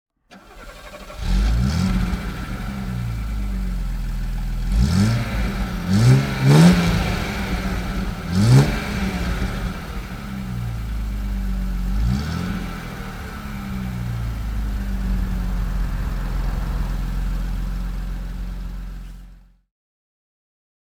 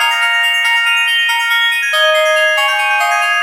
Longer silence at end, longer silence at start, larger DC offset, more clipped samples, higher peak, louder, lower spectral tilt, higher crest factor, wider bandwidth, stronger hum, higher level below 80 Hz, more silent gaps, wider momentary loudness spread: first, 1.45 s vs 0 s; first, 0.3 s vs 0 s; neither; neither; about the same, -2 dBFS vs 0 dBFS; second, -23 LUFS vs -11 LUFS; first, -6.5 dB/octave vs 6.5 dB/octave; first, 20 dB vs 12 dB; about the same, 16.5 kHz vs 16 kHz; neither; first, -26 dBFS vs under -90 dBFS; neither; first, 16 LU vs 2 LU